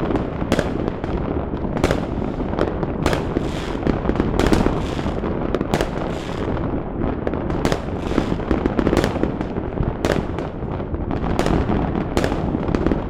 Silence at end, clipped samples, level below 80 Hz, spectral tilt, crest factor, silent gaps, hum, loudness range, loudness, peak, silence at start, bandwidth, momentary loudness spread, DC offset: 0 s; under 0.1%; -28 dBFS; -7 dB/octave; 20 dB; none; none; 2 LU; -22 LUFS; 0 dBFS; 0 s; 18 kHz; 6 LU; under 0.1%